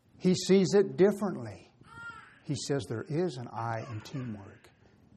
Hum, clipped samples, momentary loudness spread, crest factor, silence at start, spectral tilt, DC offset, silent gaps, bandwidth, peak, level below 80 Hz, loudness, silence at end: none; under 0.1%; 21 LU; 18 dB; 0.2 s; -6 dB/octave; under 0.1%; none; 12.5 kHz; -12 dBFS; -70 dBFS; -30 LUFS; 0.65 s